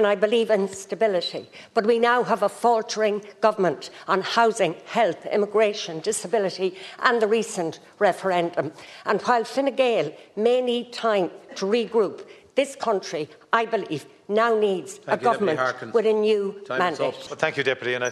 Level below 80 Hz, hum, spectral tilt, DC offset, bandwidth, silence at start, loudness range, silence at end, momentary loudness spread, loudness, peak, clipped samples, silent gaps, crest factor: -76 dBFS; none; -4 dB/octave; under 0.1%; 12.5 kHz; 0 s; 2 LU; 0 s; 9 LU; -23 LUFS; -4 dBFS; under 0.1%; none; 20 dB